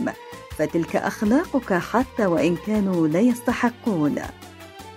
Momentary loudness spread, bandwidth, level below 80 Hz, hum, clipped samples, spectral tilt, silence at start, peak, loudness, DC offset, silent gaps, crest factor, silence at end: 17 LU; 16 kHz; -48 dBFS; none; under 0.1%; -6.5 dB/octave; 0 s; -6 dBFS; -22 LUFS; under 0.1%; none; 16 dB; 0 s